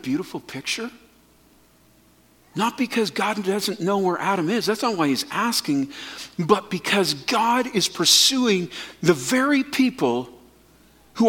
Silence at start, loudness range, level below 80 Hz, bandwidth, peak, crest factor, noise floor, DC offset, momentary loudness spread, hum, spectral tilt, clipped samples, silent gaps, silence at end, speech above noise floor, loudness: 0.05 s; 8 LU; -64 dBFS; 17.5 kHz; -2 dBFS; 22 dB; -56 dBFS; under 0.1%; 12 LU; none; -3 dB/octave; under 0.1%; none; 0 s; 34 dB; -21 LUFS